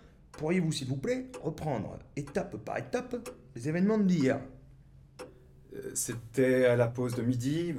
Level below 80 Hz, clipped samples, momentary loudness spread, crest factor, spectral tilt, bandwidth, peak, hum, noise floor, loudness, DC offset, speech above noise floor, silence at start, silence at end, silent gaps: -58 dBFS; under 0.1%; 18 LU; 18 dB; -6 dB/octave; 15.5 kHz; -14 dBFS; none; -55 dBFS; -31 LUFS; under 0.1%; 25 dB; 0.35 s; 0 s; none